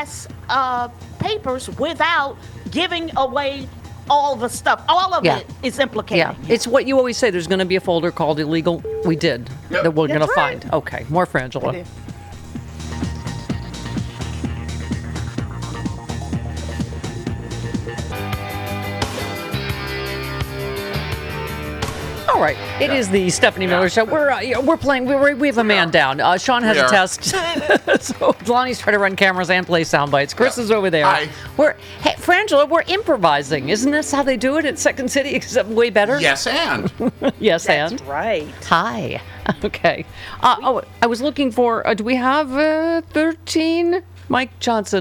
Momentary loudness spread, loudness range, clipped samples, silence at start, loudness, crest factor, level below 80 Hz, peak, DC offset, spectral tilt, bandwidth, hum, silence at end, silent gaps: 12 LU; 11 LU; under 0.1%; 0 s; -19 LUFS; 18 dB; -40 dBFS; -2 dBFS; under 0.1%; -4.5 dB/octave; 17 kHz; none; 0 s; none